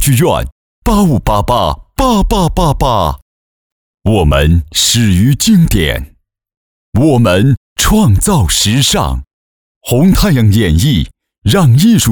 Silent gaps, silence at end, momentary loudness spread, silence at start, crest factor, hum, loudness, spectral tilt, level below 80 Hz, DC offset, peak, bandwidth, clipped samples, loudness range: 0.52-0.82 s, 3.22-3.98 s, 6.57-6.92 s, 7.57-7.76 s, 9.33-9.81 s; 0 s; 9 LU; 0 s; 10 dB; none; -11 LUFS; -5 dB/octave; -22 dBFS; 0.8%; -2 dBFS; over 20 kHz; under 0.1%; 2 LU